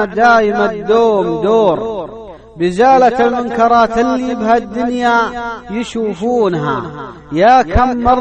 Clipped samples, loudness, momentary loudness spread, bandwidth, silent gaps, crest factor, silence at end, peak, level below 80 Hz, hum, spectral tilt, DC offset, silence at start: under 0.1%; -13 LUFS; 12 LU; 9.2 kHz; none; 12 dB; 0 s; 0 dBFS; -32 dBFS; none; -6 dB/octave; under 0.1%; 0 s